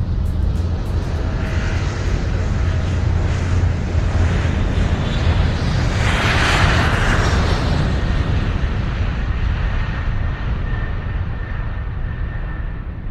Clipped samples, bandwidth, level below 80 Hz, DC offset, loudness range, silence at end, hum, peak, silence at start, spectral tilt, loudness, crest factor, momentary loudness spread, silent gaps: under 0.1%; 11 kHz; -22 dBFS; under 0.1%; 6 LU; 0 s; none; -2 dBFS; 0 s; -6 dB/octave; -20 LUFS; 16 dB; 10 LU; none